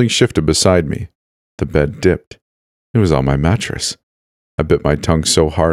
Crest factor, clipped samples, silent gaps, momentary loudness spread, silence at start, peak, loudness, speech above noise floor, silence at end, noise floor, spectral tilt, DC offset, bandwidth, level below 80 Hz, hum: 16 dB; under 0.1%; 1.15-1.58 s, 2.27-2.31 s, 2.42-2.94 s, 4.03-4.58 s; 12 LU; 0 s; 0 dBFS; -15 LUFS; over 76 dB; 0 s; under -90 dBFS; -5 dB/octave; under 0.1%; 15.5 kHz; -30 dBFS; none